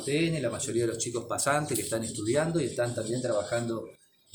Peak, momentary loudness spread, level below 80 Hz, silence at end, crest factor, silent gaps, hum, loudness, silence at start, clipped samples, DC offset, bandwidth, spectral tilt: -12 dBFS; 5 LU; -62 dBFS; 0.4 s; 18 dB; none; none; -30 LUFS; 0 s; under 0.1%; under 0.1%; over 20 kHz; -4.5 dB/octave